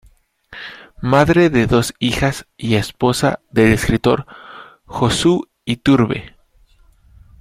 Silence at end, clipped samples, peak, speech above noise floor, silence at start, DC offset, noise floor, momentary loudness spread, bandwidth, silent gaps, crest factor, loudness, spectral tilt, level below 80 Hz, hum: 1.1 s; under 0.1%; -2 dBFS; 36 dB; 0.5 s; under 0.1%; -52 dBFS; 19 LU; 16 kHz; none; 16 dB; -16 LUFS; -5.5 dB/octave; -38 dBFS; none